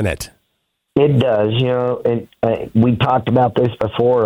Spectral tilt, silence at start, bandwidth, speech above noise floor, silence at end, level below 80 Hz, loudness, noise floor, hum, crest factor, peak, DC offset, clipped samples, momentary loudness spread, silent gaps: -7.5 dB/octave; 0 s; 15.5 kHz; 55 dB; 0 s; -44 dBFS; -16 LUFS; -70 dBFS; none; 14 dB; -2 dBFS; under 0.1%; under 0.1%; 7 LU; none